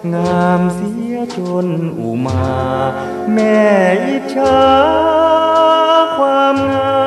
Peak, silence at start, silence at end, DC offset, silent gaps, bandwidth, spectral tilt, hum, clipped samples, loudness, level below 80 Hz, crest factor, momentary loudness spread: 0 dBFS; 0 s; 0 s; under 0.1%; none; 13 kHz; -6.5 dB/octave; none; under 0.1%; -13 LUFS; -42 dBFS; 12 dB; 9 LU